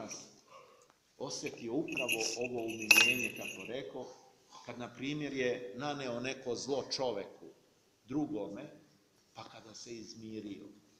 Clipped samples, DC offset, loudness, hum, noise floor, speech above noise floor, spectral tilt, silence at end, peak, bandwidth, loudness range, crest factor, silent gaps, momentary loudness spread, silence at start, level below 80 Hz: under 0.1%; under 0.1%; -34 LUFS; none; -69 dBFS; 32 dB; -2.5 dB/octave; 0.2 s; -6 dBFS; 15.5 kHz; 13 LU; 32 dB; none; 20 LU; 0 s; -74 dBFS